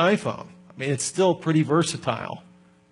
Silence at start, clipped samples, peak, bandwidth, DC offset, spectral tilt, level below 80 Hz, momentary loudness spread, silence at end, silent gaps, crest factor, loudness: 0 s; under 0.1%; -8 dBFS; 11 kHz; under 0.1%; -5 dB/octave; -68 dBFS; 17 LU; 0.5 s; none; 16 dB; -24 LUFS